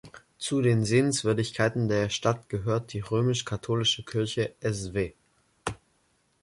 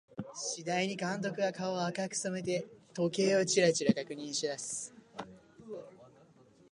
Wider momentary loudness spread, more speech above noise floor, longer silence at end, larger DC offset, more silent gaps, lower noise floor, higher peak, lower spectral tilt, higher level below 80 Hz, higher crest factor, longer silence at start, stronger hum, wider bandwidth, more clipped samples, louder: second, 12 LU vs 20 LU; first, 43 dB vs 29 dB; about the same, 0.65 s vs 0.65 s; neither; neither; first, -69 dBFS vs -62 dBFS; about the same, -10 dBFS vs -12 dBFS; about the same, -5 dB/octave vs -4 dB/octave; first, -54 dBFS vs -76 dBFS; about the same, 18 dB vs 22 dB; about the same, 0.05 s vs 0.1 s; neither; about the same, 11.5 kHz vs 11.5 kHz; neither; first, -28 LUFS vs -33 LUFS